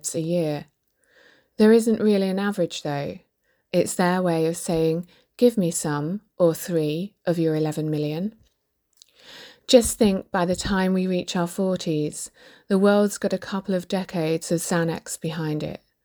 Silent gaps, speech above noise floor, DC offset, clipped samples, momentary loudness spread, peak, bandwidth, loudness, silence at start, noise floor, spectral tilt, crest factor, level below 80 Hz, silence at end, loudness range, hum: none; 48 dB; under 0.1%; under 0.1%; 12 LU; -2 dBFS; over 20 kHz; -23 LUFS; 0.05 s; -71 dBFS; -5.5 dB/octave; 22 dB; -52 dBFS; 0.3 s; 2 LU; none